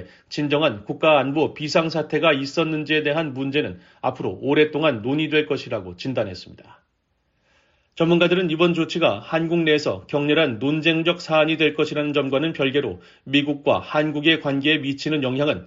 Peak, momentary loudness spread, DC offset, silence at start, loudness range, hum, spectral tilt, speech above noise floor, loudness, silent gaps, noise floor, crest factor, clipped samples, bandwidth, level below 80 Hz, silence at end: -4 dBFS; 8 LU; under 0.1%; 0 s; 4 LU; none; -3.5 dB/octave; 49 dB; -21 LUFS; none; -70 dBFS; 18 dB; under 0.1%; 7.6 kHz; -60 dBFS; 0 s